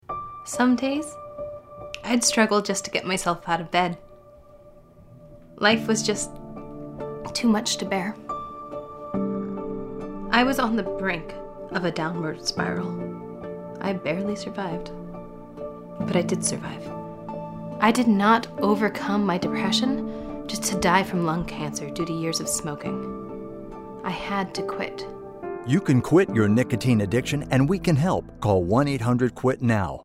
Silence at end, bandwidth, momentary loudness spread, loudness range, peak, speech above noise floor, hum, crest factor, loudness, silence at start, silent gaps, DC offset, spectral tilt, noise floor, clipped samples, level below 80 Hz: 0 s; 16 kHz; 16 LU; 7 LU; -4 dBFS; 26 dB; none; 22 dB; -24 LUFS; 0.1 s; none; under 0.1%; -5 dB/octave; -49 dBFS; under 0.1%; -50 dBFS